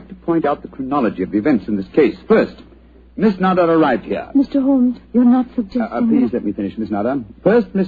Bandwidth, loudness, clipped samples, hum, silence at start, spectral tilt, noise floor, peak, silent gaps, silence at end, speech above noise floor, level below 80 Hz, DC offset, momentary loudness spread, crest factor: 4.9 kHz; -17 LUFS; under 0.1%; none; 0 s; -9.5 dB/octave; -44 dBFS; -2 dBFS; none; 0 s; 28 dB; -46 dBFS; under 0.1%; 8 LU; 14 dB